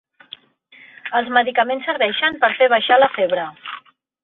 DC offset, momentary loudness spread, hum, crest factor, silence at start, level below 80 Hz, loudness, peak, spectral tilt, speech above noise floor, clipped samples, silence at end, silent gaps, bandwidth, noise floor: under 0.1%; 19 LU; none; 18 dB; 1.05 s; -66 dBFS; -17 LUFS; -2 dBFS; -7 dB/octave; 32 dB; under 0.1%; 0.45 s; none; 4.2 kHz; -49 dBFS